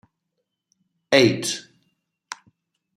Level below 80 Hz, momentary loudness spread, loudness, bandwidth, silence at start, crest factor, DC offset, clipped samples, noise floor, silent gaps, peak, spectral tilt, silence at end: -66 dBFS; 22 LU; -20 LUFS; 16 kHz; 1.1 s; 24 dB; under 0.1%; under 0.1%; -79 dBFS; none; -2 dBFS; -4 dB/octave; 0.6 s